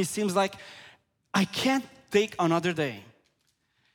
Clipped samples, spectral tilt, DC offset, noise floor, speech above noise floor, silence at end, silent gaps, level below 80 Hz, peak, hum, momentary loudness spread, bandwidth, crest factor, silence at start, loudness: under 0.1%; -4.5 dB/octave; under 0.1%; -73 dBFS; 46 dB; 0.9 s; none; -70 dBFS; -10 dBFS; none; 19 LU; 19 kHz; 18 dB; 0 s; -27 LUFS